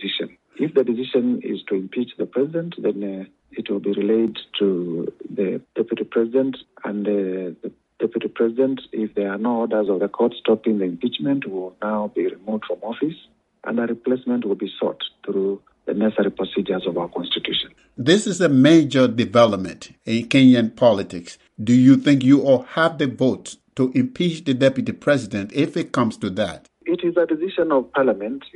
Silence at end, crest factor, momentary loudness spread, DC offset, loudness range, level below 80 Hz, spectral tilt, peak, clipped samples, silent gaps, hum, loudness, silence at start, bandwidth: 0.1 s; 20 dB; 13 LU; under 0.1%; 8 LU; -62 dBFS; -6 dB/octave; 0 dBFS; under 0.1%; none; none; -21 LUFS; 0 s; 10 kHz